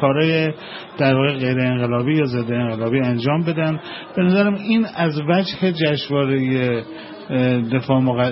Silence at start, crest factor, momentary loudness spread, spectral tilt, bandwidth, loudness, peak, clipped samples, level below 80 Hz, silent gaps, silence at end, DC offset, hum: 0 s; 16 dB; 7 LU; -11.5 dB/octave; 5.8 kHz; -19 LUFS; -2 dBFS; under 0.1%; -56 dBFS; none; 0 s; under 0.1%; none